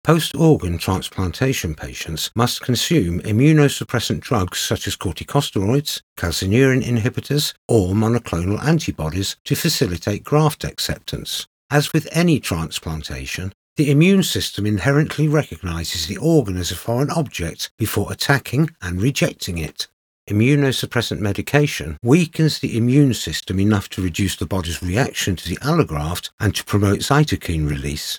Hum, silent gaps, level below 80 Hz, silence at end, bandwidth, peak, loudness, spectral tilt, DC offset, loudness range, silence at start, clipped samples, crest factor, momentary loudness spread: none; 6.03-6.16 s, 7.58-7.69 s, 9.40-9.45 s, 11.47-11.69 s, 13.54-13.76 s, 17.71-17.78 s, 19.93-20.27 s, 26.33-26.38 s; -42 dBFS; 0 s; over 20 kHz; 0 dBFS; -19 LUFS; -5.5 dB/octave; under 0.1%; 3 LU; 0.05 s; under 0.1%; 18 dB; 10 LU